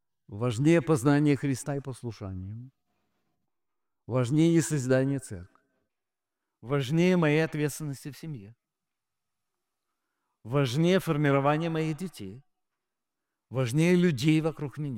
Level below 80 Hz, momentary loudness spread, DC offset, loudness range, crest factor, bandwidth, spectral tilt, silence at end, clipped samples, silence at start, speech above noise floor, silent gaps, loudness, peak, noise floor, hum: -62 dBFS; 17 LU; under 0.1%; 4 LU; 18 dB; 16.5 kHz; -6.5 dB/octave; 0 s; under 0.1%; 0.3 s; 63 dB; none; -26 LUFS; -10 dBFS; -89 dBFS; none